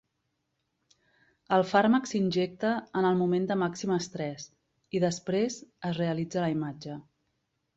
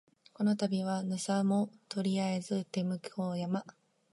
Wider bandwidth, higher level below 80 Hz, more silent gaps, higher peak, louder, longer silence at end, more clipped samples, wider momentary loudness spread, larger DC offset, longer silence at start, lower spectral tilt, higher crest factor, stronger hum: second, 8 kHz vs 11.5 kHz; first, -70 dBFS vs -82 dBFS; neither; first, -10 dBFS vs -18 dBFS; first, -29 LUFS vs -34 LUFS; first, 0.75 s vs 0.4 s; neither; first, 12 LU vs 7 LU; neither; first, 1.5 s vs 0.4 s; about the same, -6 dB/octave vs -6 dB/octave; about the same, 20 dB vs 16 dB; neither